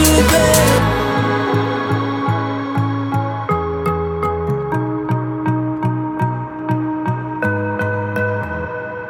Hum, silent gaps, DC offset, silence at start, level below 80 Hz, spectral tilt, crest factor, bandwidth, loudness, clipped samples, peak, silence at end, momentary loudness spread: none; none; under 0.1%; 0 s; -32 dBFS; -5 dB/octave; 16 dB; 19.5 kHz; -18 LUFS; under 0.1%; -2 dBFS; 0 s; 9 LU